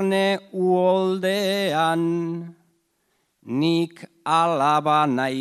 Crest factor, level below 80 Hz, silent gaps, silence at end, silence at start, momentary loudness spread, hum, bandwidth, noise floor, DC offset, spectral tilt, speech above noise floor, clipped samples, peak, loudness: 16 dB; -74 dBFS; none; 0 s; 0 s; 11 LU; none; 14 kHz; -70 dBFS; under 0.1%; -5.5 dB/octave; 49 dB; under 0.1%; -6 dBFS; -21 LUFS